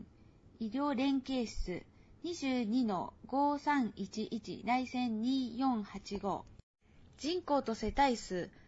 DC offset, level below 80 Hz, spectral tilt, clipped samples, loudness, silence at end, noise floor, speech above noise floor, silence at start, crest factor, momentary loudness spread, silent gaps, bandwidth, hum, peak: under 0.1%; -54 dBFS; -4 dB/octave; under 0.1%; -36 LUFS; 0.05 s; -61 dBFS; 26 dB; 0 s; 18 dB; 11 LU; 6.63-6.74 s; 7.6 kHz; none; -18 dBFS